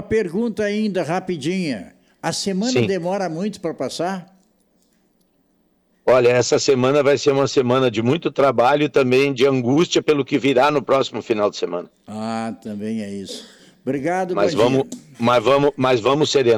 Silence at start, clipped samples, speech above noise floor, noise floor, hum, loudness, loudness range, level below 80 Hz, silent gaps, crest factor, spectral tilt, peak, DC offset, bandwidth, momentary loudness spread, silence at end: 0 s; under 0.1%; 44 dB; -63 dBFS; none; -19 LUFS; 8 LU; -56 dBFS; none; 12 dB; -5 dB/octave; -8 dBFS; under 0.1%; 13.5 kHz; 11 LU; 0 s